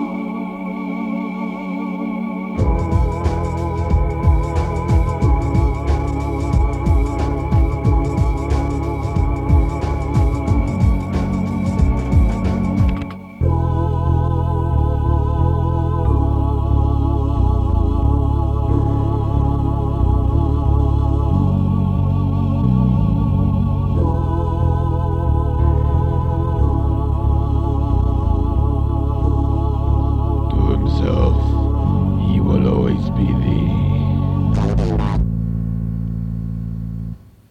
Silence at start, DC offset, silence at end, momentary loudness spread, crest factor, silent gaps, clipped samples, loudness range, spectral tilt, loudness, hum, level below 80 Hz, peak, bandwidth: 0 s; under 0.1%; 0.35 s; 6 LU; 14 dB; none; under 0.1%; 2 LU; -9.5 dB/octave; -18 LUFS; none; -20 dBFS; -2 dBFS; 8.2 kHz